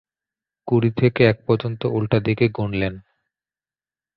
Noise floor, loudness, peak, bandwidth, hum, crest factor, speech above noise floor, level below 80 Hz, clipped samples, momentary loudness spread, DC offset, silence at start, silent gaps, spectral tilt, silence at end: under -90 dBFS; -20 LUFS; -2 dBFS; 5 kHz; none; 20 dB; over 71 dB; -48 dBFS; under 0.1%; 8 LU; under 0.1%; 0.65 s; none; -10.5 dB/octave; 1.15 s